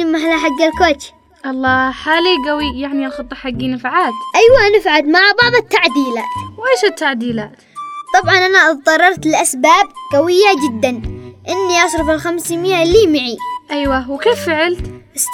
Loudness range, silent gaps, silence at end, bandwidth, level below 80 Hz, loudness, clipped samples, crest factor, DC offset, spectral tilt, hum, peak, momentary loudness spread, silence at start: 4 LU; none; 0 s; 20 kHz; -38 dBFS; -13 LUFS; under 0.1%; 14 dB; under 0.1%; -3 dB/octave; none; 0 dBFS; 14 LU; 0 s